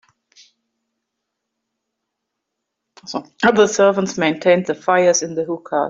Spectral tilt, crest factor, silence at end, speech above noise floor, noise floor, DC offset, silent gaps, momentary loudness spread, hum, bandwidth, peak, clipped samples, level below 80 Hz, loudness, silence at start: -4 dB/octave; 18 dB; 0 s; 62 dB; -79 dBFS; under 0.1%; none; 12 LU; none; 7.8 kHz; -2 dBFS; under 0.1%; -62 dBFS; -16 LUFS; 3.05 s